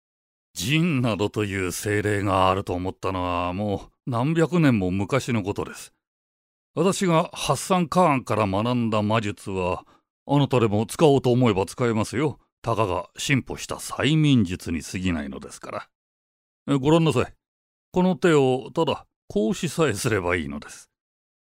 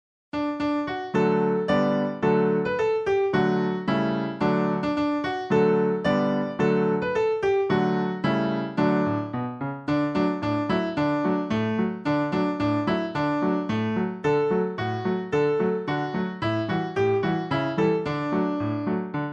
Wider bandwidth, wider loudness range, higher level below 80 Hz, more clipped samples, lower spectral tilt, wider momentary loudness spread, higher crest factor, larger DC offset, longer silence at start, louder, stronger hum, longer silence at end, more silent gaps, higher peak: first, 16 kHz vs 8 kHz; about the same, 3 LU vs 2 LU; about the same, -52 dBFS vs -56 dBFS; neither; second, -6 dB/octave vs -8 dB/octave; first, 13 LU vs 5 LU; about the same, 20 dB vs 16 dB; neither; first, 0.55 s vs 0.35 s; about the same, -23 LUFS vs -25 LUFS; neither; first, 0.7 s vs 0 s; first, 6.07-6.74 s, 10.10-10.26 s, 12.52-12.62 s, 15.95-16.66 s, 17.48-17.92 s, 19.16-19.28 s vs none; first, -4 dBFS vs -8 dBFS